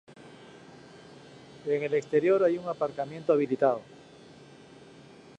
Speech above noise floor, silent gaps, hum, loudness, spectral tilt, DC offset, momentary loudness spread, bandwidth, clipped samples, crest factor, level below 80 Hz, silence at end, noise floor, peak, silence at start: 25 dB; none; none; -28 LUFS; -7 dB/octave; under 0.1%; 26 LU; 9.6 kHz; under 0.1%; 20 dB; -74 dBFS; 0.35 s; -52 dBFS; -10 dBFS; 0.1 s